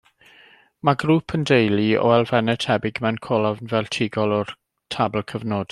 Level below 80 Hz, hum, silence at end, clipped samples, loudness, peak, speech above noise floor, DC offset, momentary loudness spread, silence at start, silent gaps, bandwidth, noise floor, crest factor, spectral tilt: -58 dBFS; none; 0.05 s; under 0.1%; -21 LUFS; -2 dBFS; 32 dB; under 0.1%; 8 LU; 0.85 s; none; 12 kHz; -52 dBFS; 20 dB; -6.5 dB/octave